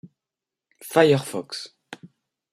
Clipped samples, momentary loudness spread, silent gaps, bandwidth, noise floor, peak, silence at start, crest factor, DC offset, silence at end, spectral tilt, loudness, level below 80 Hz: under 0.1%; 25 LU; none; 16 kHz; -88 dBFS; -4 dBFS; 0.85 s; 22 dB; under 0.1%; 0.45 s; -5 dB/octave; -21 LUFS; -68 dBFS